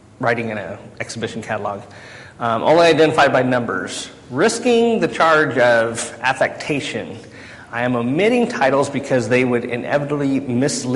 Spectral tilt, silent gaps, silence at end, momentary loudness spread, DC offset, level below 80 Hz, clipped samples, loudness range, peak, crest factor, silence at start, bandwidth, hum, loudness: -4.5 dB/octave; none; 0 s; 16 LU; under 0.1%; -54 dBFS; under 0.1%; 4 LU; -4 dBFS; 14 dB; 0.2 s; 11.5 kHz; none; -18 LUFS